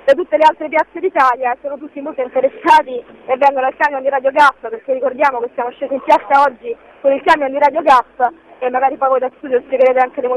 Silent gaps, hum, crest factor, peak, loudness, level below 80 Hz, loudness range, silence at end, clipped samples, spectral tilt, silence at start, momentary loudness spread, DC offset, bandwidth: none; none; 14 dB; -2 dBFS; -14 LUFS; -56 dBFS; 1 LU; 0 s; under 0.1%; -3.5 dB/octave; 0.05 s; 12 LU; under 0.1%; 11.5 kHz